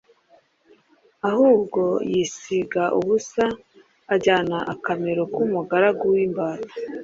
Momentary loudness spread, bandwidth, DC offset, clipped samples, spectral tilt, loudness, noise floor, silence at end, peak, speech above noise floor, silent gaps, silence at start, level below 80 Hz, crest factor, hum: 8 LU; 7.8 kHz; under 0.1%; under 0.1%; -5.5 dB/octave; -22 LUFS; -59 dBFS; 0 s; -4 dBFS; 37 dB; none; 1.25 s; -62 dBFS; 18 dB; none